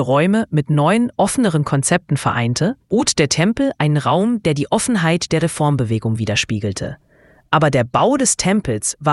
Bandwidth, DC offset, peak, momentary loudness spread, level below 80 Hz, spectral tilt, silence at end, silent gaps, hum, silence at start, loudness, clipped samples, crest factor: 12 kHz; under 0.1%; 0 dBFS; 5 LU; -46 dBFS; -5 dB/octave; 0 s; none; none; 0 s; -17 LUFS; under 0.1%; 16 dB